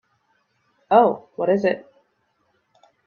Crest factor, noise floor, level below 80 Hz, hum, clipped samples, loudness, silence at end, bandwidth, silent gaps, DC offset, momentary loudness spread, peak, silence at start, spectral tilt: 22 dB; -68 dBFS; -70 dBFS; none; under 0.1%; -20 LUFS; 1.25 s; 6.8 kHz; none; under 0.1%; 9 LU; -2 dBFS; 0.9 s; -8 dB/octave